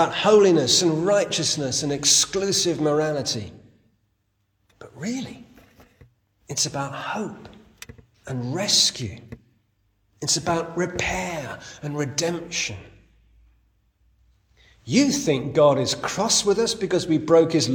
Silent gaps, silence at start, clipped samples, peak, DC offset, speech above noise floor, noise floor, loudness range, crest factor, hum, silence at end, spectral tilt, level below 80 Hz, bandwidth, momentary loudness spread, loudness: none; 0 s; under 0.1%; -4 dBFS; under 0.1%; 49 dB; -71 dBFS; 11 LU; 20 dB; none; 0 s; -3 dB/octave; -54 dBFS; 18 kHz; 15 LU; -21 LUFS